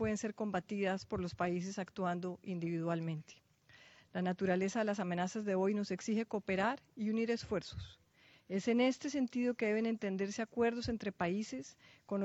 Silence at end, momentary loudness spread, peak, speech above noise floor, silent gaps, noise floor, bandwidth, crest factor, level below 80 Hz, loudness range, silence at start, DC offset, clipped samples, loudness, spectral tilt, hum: 0 s; 8 LU; -20 dBFS; 29 dB; none; -65 dBFS; 8.2 kHz; 18 dB; -66 dBFS; 3 LU; 0 s; under 0.1%; under 0.1%; -37 LUFS; -6 dB/octave; none